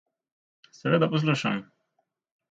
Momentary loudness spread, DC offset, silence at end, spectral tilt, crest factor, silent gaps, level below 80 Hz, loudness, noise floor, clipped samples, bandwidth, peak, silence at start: 11 LU; under 0.1%; 0.85 s; -6.5 dB/octave; 20 dB; none; -72 dBFS; -26 LUFS; -77 dBFS; under 0.1%; 8 kHz; -8 dBFS; 0.85 s